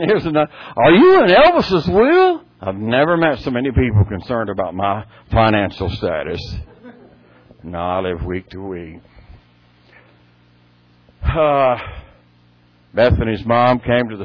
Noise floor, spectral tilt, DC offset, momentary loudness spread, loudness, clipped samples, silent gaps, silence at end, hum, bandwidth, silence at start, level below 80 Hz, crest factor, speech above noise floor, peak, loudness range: -52 dBFS; -8.5 dB/octave; under 0.1%; 17 LU; -16 LUFS; under 0.1%; none; 0 s; 60 Hz at -45 dBFS; 5.4 kHz; 0 s; -34 dBFS; 16 dB; 37 dB; -2 dBFS; 15 LU